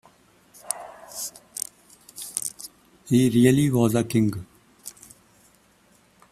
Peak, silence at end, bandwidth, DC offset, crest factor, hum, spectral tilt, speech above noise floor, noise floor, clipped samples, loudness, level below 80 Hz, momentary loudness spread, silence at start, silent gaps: -4 dBFS; 1.4 s; 15.5 kHz; under 0.1%; 22 dB; none; -5.5 dB/octave; 40 dB; -59 dBFS; under 0.1%; -24 LUFS; -58 dBFS; 23 LU; 0.65 s; none